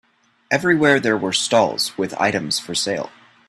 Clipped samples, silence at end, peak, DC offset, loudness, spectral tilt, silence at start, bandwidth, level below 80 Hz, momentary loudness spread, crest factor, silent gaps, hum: under 0.1%; 0.4 s; -2 dBFS; under 0.1%; -19 LUFS; -3.5 dB/octave; 0.5 s; 14 kHz; -60 dBFS; 8 LU; 18 dB; none; none